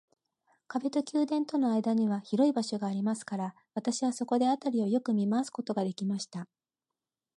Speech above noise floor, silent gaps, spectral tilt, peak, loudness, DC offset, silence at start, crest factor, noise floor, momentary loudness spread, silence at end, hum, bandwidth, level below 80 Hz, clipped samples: over 60 dB; none; -6 dB/octave; -14 dBFS; -31 LUFS; under 0.1%; 0.7 s; 16 dB; under -90 dBFS; 9 LU; 0.9 s; none; 11.5 kHz; -84 dBFS; under 0.1%